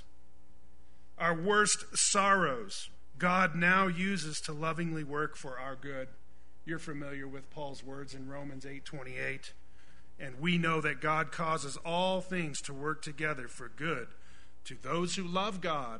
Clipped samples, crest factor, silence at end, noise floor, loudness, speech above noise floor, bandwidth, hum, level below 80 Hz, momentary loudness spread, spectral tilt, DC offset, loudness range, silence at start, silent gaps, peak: under 0.1%; 22 dB; 0 s; -62 dBFS; -32 LUFS; 28 dB; 10.5 kHz; none; -62 dBFS; 18 LU; -3.5 dB/octave; 1%; 14 LU; 1.2 s; none; -12 dBFS